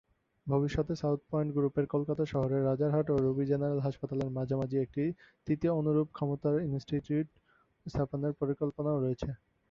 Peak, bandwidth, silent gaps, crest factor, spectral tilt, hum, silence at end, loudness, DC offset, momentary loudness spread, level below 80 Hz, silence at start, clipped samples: -16 dBFS; 7.2 kHz; none; 16 dB; -9.5 dB/octave; none; 0.35 s; -32 LUFS; under 0.1%; 6 LU; -56 dBFS; 0.45 s; under 0.1%